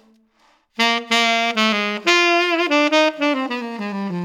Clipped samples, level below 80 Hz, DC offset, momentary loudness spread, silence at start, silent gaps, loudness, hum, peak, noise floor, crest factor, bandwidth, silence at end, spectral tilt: under 0.1%; -72 dBFS; under 0.1%; 11 LU; 0.8 s; none; -17 LUFS; none; -2 dBFS; -59 dBFS; 16 dB; 18 kHz; 0 s; -3 dB/octave